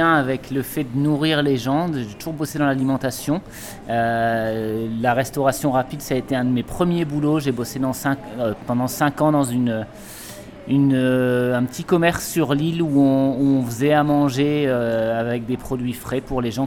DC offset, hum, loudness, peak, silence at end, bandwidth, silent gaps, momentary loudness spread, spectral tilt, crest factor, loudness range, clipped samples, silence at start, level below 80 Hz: under 0.1%; none; -21 LUFS; -4 dBFS; 0 s; 18 kHz; none; 8 LU; -6 dB/octave; 16 dB; 4 LU; under 0.1%; 0 s; -46 dBFS